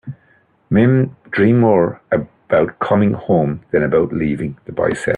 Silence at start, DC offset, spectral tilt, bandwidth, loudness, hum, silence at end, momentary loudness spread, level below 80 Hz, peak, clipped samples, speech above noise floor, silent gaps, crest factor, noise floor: 0.05 s; under 0.1%; -8.5 dB/octave; 10.5 kHz; -16 LUFS; none; 0 s; 8 LU; -48 dBFS; 0 dBFS; under 0.1%; 40 dB; none; 16 dB; -55 dBFS